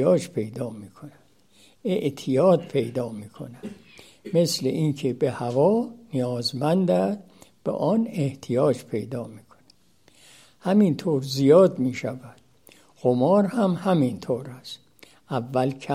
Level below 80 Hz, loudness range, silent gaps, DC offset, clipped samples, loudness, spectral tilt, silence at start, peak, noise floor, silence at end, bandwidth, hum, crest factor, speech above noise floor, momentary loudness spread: -68 dBFS; 5 LU; none; under 0.1%; under 0.1%; -24 LUFS; -7 dB/octave; 0 s; -4 dBFS; -60 dBFS; 0 s; 15.5 kHz; none; 20 dB; 37 dB; 18 LU